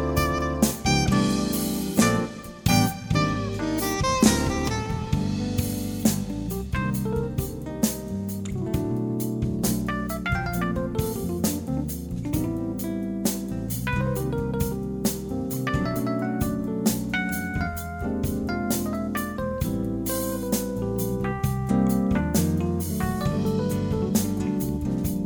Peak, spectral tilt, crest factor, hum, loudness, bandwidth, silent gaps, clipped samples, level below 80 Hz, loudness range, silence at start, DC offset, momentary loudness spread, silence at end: -4 dBFS; -5.5 dB/octave; 22 dB; none; -26 LUFS; over 20 kHz; none; under 0.1%; -38 dBFS; 4 LU; 0 s; under 0.1%; 7 LU; 0 s